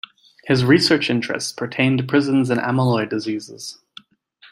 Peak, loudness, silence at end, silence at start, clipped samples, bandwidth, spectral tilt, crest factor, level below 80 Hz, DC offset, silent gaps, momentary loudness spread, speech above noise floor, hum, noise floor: -2 dBFS; -19 LUFS; 0.05 s; 0.45 s; under 0.1%; 15.5 kHz; -5.5 dB/octave; 18 dB; -58 dBFS; under 0.1%; none; 19 LU; 34 dB; none; -52 dBFS